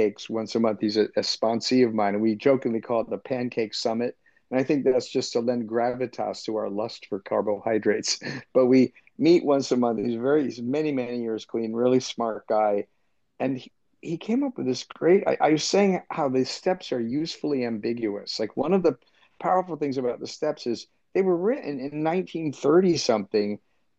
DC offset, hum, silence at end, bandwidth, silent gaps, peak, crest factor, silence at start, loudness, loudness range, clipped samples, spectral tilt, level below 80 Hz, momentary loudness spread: under 0.1%; none; 0.4 s; 8.4 kHz; none; -8 dBFS; 16 dB; 0 s; -25 LUFS; 4 LU; under 0.1%; -5 dB/octave; -70 dBFS; 9 LU